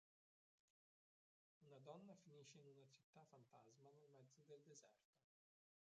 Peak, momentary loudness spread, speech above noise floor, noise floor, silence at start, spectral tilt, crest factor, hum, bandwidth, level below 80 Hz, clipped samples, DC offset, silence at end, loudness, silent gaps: -46 dBFS; 6 LU; over 20 dB; under -90 dBFS; 1.6 s; -5.5 dB/octave; 24 dB; none; 7.6 kHz; under -90 dBFS; under 0.1%; under 0.1%; 0.75 s; -66 LUFS; 3.04-3.13 s, 5.05-5.13 s